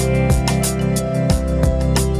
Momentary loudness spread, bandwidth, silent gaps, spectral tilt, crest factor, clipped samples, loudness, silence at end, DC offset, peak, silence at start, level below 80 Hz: 2 LU; 16 kHz; none; -5.5 dB/octave; 14 dB; under 0.1%; -18 LUFS; 0 s; under 0.1%; -4 dBFS; 0 s; -22 dBFS